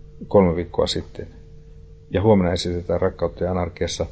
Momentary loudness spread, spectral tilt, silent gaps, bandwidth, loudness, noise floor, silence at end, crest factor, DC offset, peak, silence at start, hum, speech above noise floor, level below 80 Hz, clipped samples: 10 LU; -6 dB/octave; none; 8 kHz; -21 LUFS; -43 dBFS; 0 s; 20 dB; under 0.1%; -2 dBFS; 0 s; none; 22 dB; -36 dBFS; under 0.1%